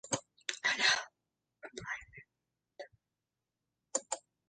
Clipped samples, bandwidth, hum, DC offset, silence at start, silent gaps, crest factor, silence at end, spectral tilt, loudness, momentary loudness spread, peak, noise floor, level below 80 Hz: under 0.1%; 9.4 kHz; none; under 0.1%; 0.05 s; none; 28 dB; 0.3 s; -0.5 dB/octave; -34 LUFS; 24 LU; -14 dBFS; -89 dBFS; -74 dBFS